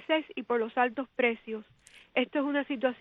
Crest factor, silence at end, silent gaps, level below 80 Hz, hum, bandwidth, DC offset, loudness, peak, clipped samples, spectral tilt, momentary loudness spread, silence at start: 20 dB; 0.05 s; none; -74 dBFS; none; 10 kHz; under 0.1%; -30 LUFS; -12 dBFS; under 0.1%; -5 dB/octave; 7 LU; 0 s